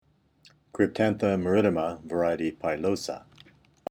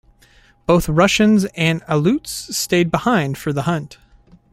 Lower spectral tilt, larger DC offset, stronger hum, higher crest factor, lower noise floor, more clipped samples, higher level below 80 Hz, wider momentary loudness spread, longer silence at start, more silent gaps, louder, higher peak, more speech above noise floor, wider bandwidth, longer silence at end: first, -6.5 dB/octave vs -5 dB/octave; neither; neither; about the same, 20 dB vs 16 dB; first, -57 dBFS vs -52 dBFS; neither; second, -60 dBFS vs -40 dBFS; first, 14 LU vs 9 LU; about the same, 0.75 s vs 0.7 s; neither; second, -27 LUFS vs -17 LUFS; second, -8 dBFS vs -2 dBFS; second, 30 dB vs 35 dB; second, 14.5 kHz vs 16.5 kHz; about the same, 0.7 s vs 0.6 s